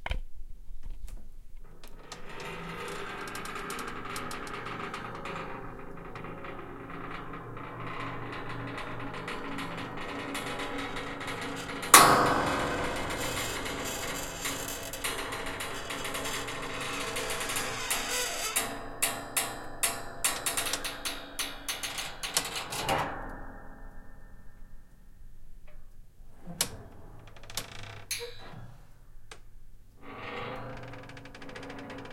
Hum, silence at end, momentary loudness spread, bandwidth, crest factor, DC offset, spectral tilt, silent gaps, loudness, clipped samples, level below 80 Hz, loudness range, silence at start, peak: none; 0 s; 18 LU; 16.5 kHz; 34 dB; under 0.1%; -2 dB/octave; none; -31 LUFS; under 0.1%; -48 dBFS; 17 LU; 0 s; 0 dBFS